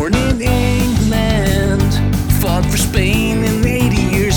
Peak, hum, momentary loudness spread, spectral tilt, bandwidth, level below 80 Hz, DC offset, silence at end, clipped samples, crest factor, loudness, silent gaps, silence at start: 0 dBFS; none; 1 LU; -5.5 dB/octave; over 20 kHz; -20 dBFS; 0.3%; 0 s; under 0.1%; 14 dB; -15 LUFS; none; 0 s